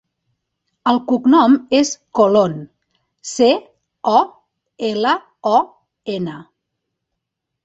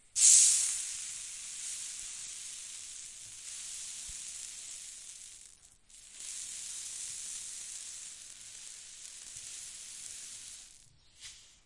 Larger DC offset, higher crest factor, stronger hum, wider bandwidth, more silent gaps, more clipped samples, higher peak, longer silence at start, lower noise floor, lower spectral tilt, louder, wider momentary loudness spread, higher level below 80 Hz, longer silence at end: neither; second, 16 dB vs 28 dB; neither; second, 8.2 kHz vs 11.5 kHz; neither; neither; first, -2 dBFS vs -8 dBFS; first, 0.85 s vs 0.15 s; first, -79 dBFS vs -60 dBFS; first, -4.5 dB/octave vs 3.5 dB/octave; first, -16 LUFS vs -31 LUFS; about the same, 15 LU vs 17 LU; first, -62 dBFS vs -70 dBFS; first, 1.25 s vs 0.15 s